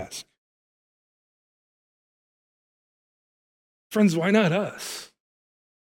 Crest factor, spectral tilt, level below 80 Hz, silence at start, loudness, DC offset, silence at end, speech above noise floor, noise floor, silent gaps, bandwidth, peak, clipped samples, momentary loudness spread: 24 dB; -5.5 dB/octave; -72 dBFS; 0 s; -23 LUFS; under 0.1%; 0.8 s; over 68 dB; under -90 dBFS; 0.38-3.90 s; 16.5 kHz; -6 dBFS; under 0.1%; 17 LU